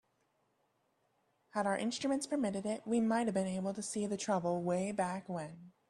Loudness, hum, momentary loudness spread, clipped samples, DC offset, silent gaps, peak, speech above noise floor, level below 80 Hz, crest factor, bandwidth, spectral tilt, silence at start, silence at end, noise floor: -36 LUFS; none; 8 LU; under 0.1%; under 0.1%; none; -20 dBFS; 43 dB; -76 dBFS; 16 dB; 12 kHz; -5 dB/octave; 1.55 s; 0.2 s; -78 dBFS